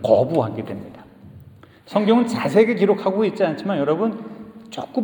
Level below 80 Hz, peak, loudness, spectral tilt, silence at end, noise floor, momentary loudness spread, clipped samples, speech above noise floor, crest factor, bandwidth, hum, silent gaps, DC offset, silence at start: -62 dBFS; -2 dBFS; -20 LUFS; -7 dB/octave; 0 s; -46 dBFS; 18 LU; under 0.1%; 27 dB; 18 dB; 19 kHz; none; none; under 0.1%; 0 s